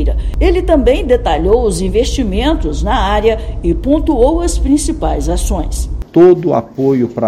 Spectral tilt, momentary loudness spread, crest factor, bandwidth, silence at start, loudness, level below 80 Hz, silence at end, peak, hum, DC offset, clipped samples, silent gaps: -6 dB/octave; 7 LU; 12 dB; 13.5 kHz; 0 s; -13 LUFS; -18 dBFS; 0 s; 0 dBFS; none; under 0.1%; 0.3%; none